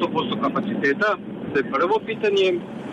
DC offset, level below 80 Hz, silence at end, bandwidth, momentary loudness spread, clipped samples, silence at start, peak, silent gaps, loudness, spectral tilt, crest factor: under 0.1%; -60 dBFS; 0 s; 8.8 kHz; 6 LU; under 0.1%; 0 s; -12 dBFS; none; -22 LUFS; -6 dB/octave; 12 dB